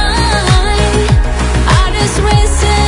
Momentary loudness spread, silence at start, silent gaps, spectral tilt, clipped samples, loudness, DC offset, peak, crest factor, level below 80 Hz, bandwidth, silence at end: 2 LU; 0 s; none; -4.5 dB/octave; under 0.1%; -11 LUFS; under 0.1%; 0 dBFS; 10 dB; -12 dBFS; 11 kHz; 0 s